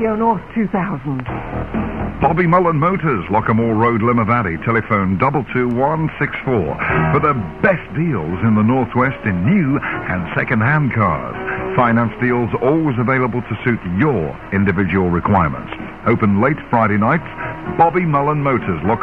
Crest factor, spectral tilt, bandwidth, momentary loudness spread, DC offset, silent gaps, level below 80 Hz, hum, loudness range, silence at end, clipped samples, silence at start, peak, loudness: 16 dB; -10 dB/octave; 5 kHz; 7 LU; 0.4%; none; -38 dBFS; none; 1 LU; 0 s; under 0.1%; 0 s; -2 dBFS; -17 LUFS